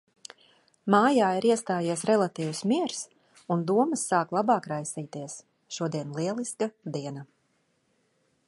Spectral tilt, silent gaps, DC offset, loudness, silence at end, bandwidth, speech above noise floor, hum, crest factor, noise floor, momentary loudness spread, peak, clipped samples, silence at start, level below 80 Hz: -5 dB/octave; none; under 0.1%; -27 LUFS; 1.25 s; 11.5 kHz; 45 dB; none; 22 dB; -71 dBFS; 18 LU; -6 dBFS; under 0.1%; 0.85 s; -76 dBFS